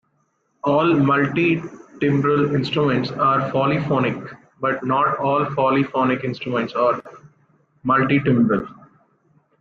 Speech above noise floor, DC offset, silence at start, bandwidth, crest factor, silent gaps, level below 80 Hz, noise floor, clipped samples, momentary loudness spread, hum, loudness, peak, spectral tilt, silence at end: 48 dB; under 0.1%; 0.65 s; 7 kHz; 14 dB; none; -56 dBFS; -67 dBFS; under 0.1%; 8 LU; none; -20 LUFS; -6 dBFS; -8.5 dB/octave; 0.9 s